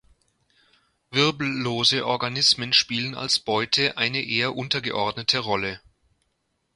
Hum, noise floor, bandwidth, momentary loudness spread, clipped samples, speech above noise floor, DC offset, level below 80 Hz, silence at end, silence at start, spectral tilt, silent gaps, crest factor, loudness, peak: none; -74 dBFS; 11.5 kHz; 7 LU; under 0.1%; 49 dB; under 0.1%; -60 dBFS; 1 s; 1.1 s; -3 dB/octave; none; 20 dB; -22 LUFS; -4 dBFS